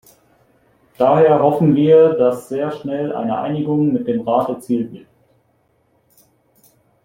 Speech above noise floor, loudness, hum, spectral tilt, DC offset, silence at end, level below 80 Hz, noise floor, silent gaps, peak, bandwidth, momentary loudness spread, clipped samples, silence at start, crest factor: 46 dB; -16 LUFS; none; -8.5 dB/octave; under 0.1%; 2.05 s; -60 dBFS; -61 dBFS; none; -2 dBFS; 15.5 kHz; 11 LU; under 0.1%; 1 s; 16 dB